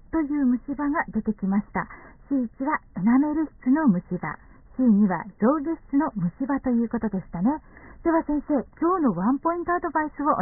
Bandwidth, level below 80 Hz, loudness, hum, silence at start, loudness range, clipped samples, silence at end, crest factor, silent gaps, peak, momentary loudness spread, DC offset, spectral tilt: 2.4 kHz; -50 dBFS; -25 LUFS; none; 0.15 s; 2 LU; under 0.1%; 0 s; 16 dB; none; -8 dBFS; 8 LU; 0.1%; -4.5 dB/octave